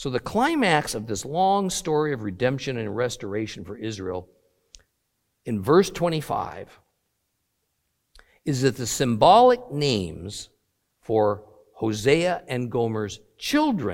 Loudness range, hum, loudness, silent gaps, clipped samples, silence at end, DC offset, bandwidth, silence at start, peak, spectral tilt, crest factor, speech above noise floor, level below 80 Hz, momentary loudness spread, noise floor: 7 LU; none; -23 LUFS; none; under 0.1%; 0 s; under 0.1%; 16.5 kHz; 0 s; -4 dBFS; -5 dB/octave; 20 dB; 52 dB; -54 dBFS; 15 LU; -75 dBFS